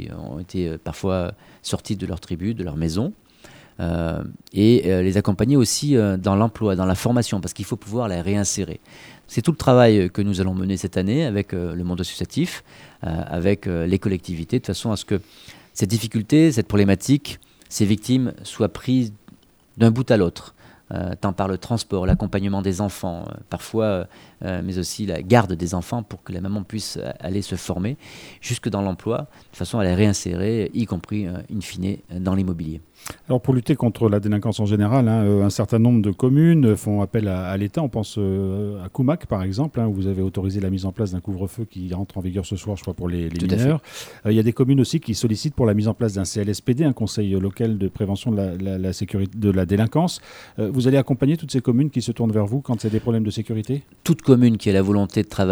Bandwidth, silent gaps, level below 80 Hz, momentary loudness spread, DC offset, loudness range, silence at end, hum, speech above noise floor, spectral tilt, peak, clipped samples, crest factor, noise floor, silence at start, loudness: over 20 kHz; none; -44 dBFS; 11 LU; under 0.1%; 6 LU; 0 s; none; 30 dB; -6.5 dB/octave; 0 dBFS; under 0.1%; 20 dB; -51 dBFS; 0 s; -22 LUFS